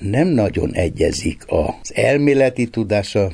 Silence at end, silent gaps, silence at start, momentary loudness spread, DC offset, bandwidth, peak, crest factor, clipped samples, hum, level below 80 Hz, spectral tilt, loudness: 0 s; none; 0 s; 6 LU; under 0.1%; 11 kHz; -2 dBFS; 16 dB; under 0.1%; none; -36 dBFS; -6 dB/octave; -18 LUFS